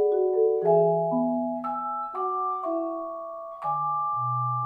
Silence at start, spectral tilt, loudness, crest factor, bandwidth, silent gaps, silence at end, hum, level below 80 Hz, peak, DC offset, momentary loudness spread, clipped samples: 0 s; -11.5 dB/octave; -26 LUFS; 16 dB; 3.6 kHz; none; 0 s; none; -74 dBFS; -10 dBFS; under 0.1%; 12 LU; under 0.1%